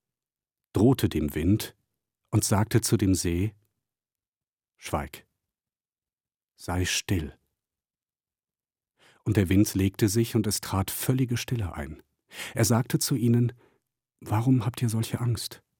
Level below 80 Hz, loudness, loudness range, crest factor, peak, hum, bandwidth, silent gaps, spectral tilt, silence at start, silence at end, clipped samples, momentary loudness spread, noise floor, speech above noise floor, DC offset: -52 dBFS; -26 LUFS; 8 LU; 20 dB; -8 dBFS; none; 17.5 kHz; 4.28-4.32 s, 4.49-4.56 s; -5.5 dB/octave; 0.75 s; 0.25 s; under 0.1%; 12 LU; under -90 dBFS; over 65 dB; under 0.1%